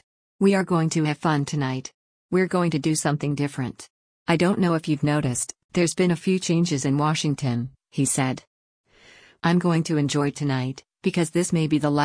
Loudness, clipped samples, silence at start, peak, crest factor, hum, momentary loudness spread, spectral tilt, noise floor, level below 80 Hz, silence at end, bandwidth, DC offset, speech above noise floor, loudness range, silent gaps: -23 LUFS; under 0.1%; 0.4 s; -8 dBFS; 16 dB; none; 7 LU; -5.5 dB/octave; -52 dBFS; -58 dBFS; 0 s; 10.5 kHz; under 0.1%; 30 dB; 2 LU; 1.94-2.29 s, 3.90-4.26 s, 5.64-5.69 s, 8.47-8.84 s